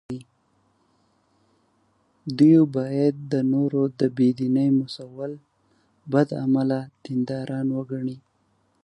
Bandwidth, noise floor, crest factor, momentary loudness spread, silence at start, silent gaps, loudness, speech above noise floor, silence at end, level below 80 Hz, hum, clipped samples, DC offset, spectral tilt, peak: 9.6 kHz; -67 dBFS; 18 dB; 16 LU; 0.1 s; none; -23 LUFS; 45 dB; 0.65 s; -68 dBFS; none; under 0.1%; under 0.1%; -8.5 dB/octave; -6 dBFS